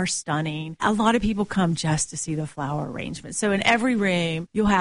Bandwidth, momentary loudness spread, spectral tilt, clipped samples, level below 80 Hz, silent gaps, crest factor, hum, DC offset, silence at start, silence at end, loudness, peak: 11 kHz; 9 LU; -4.5 dB/octave; under 0.1%; -44 dBFS; none; 18 dB; none; 0.2%; 0 s; 0 s; -24 LUFS; -6 dBFS